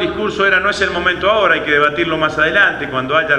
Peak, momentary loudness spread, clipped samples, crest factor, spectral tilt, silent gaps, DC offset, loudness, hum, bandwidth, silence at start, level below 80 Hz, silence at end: 0 dBFS; 4 LU; under 0.1%; 14 dB; -4.5 dB/octave; none; under 0.1%; -14 LUFS; none; 11 kHz; 0 s; -40 dBFS; 0 s